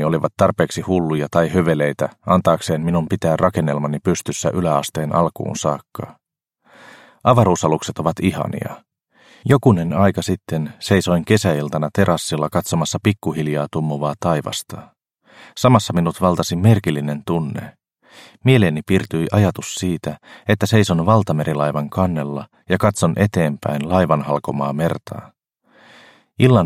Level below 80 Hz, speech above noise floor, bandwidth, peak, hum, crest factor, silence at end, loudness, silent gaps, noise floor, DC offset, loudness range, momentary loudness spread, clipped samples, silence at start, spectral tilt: -48 dBFS; 43 dB; 15.5 kHz; 0 dBFS; none; 18 dB; 0 s; -18 LUFS; none; -61 dBFS; under 0.1%; 3 LU; 10 LU; under 0.1%; 0 s; -6 dB/octave